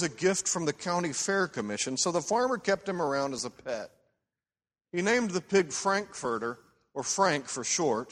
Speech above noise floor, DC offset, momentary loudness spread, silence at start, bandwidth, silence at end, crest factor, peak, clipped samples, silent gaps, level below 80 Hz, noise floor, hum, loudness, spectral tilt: over 60 dB; under 0.1%; 10 LU; 0 s; 13 kHz; 0 s; 20 dB; -10 dBFS; under 0.1%; none; -68 dBFS; under -90 dBFS; none; -29 LUFS; -3 dB/octave